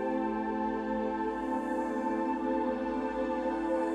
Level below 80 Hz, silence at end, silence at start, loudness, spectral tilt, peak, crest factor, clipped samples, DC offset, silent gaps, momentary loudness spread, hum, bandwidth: -56 dBFS; 0 s; 0 s; -32 LUFS; -6.5 dB/octave; -20 dBFS; 12 dB; under 0.1%; under 0.1%; none; 2 LU; none; 11 kHz